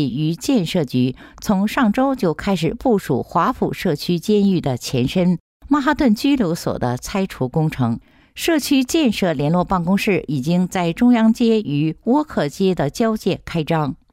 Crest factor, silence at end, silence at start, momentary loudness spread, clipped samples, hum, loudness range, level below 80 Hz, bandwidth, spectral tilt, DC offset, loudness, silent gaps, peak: 12 dB; 0.15 s; 0 s; 6 LU; under 0.1%; none; 2 LU; -44 dBFS; 16 kHz; -6 dB/octave; under 0.1%; -19 LUFS; 5.40-5.60 s; -6 dBFS